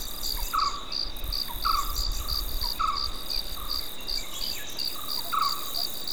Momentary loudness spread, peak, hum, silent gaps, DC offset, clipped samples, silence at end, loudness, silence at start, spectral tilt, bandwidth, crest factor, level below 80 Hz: 5 LU; -12 dBFS; none; none; 2%; under 0.1%; 0 s; -29 LUFS; 0 s; -1.5 dB/octave; over 20 kHz; 16 dB; -36 dBFS